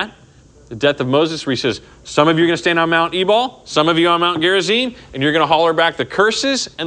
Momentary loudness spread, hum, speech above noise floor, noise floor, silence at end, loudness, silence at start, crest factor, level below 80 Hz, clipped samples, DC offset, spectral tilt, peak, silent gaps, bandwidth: 7 LU; none; 30 dB; -46 dBFS; 0 s; -15 LUFS; 0 s; 16 dB; -52 dBFS; under 0.1%; under 0.1%; -4 dB/octave; 0 dBFS; none; 10 kHz